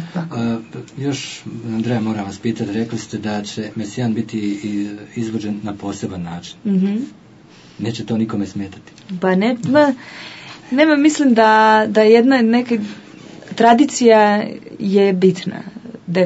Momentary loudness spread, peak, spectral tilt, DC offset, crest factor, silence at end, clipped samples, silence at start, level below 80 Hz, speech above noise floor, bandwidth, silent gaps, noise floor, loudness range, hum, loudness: 18 LU; 0 dBFS; -5.5 dB/octave; under 0.1%; 16 dB; 0 s; under 0.1%; 0 s; -62 dBFS; 27 dB; 8 kHz; none; -44 dBFS; 10 LU; none; -17 LUFS